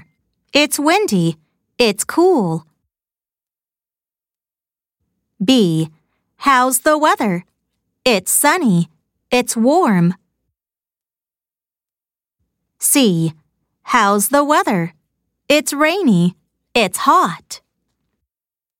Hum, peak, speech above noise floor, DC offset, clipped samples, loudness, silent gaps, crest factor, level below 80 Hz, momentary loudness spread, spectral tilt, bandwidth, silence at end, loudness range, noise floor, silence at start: none; 0 dBFS; over 76 dB; under 0.1%; under 0.1%; -15 LUFS; none; 18 dB; -58 dBFS; 9 LU; -4 dB/octave; 17 kHz; 1.2 s; 6 LU; under -90 dBFS; 0.55 s